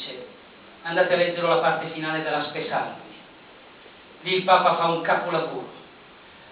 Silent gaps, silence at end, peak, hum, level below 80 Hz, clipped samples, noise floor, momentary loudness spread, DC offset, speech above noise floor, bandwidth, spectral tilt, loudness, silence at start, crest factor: none; 0 s; -4 dBFS; none; -70 dBFS; under 0.1%; -48 dBFS; 21 LU; under 0.1%; 25 dB; 4 kHz; -8.5 dB/octave; -23 LUFS; 0 s; 20 dB